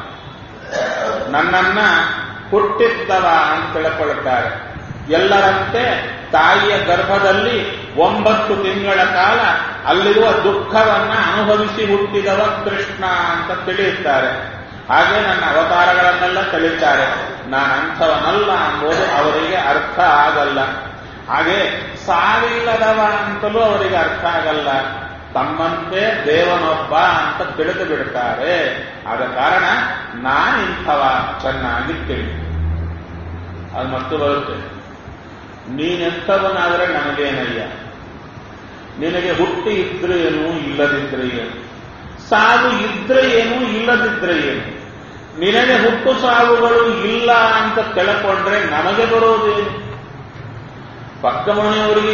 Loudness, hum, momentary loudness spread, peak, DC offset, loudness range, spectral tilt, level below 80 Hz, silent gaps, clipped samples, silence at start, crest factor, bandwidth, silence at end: -15 LUFS; none; 17 LU; 0 dBFS; under 0.1%; 6 LU; -2 dB/octave; -40 dBFS; none; under 0.1%; 0 s; 16 dB; 7 kHz; 0 s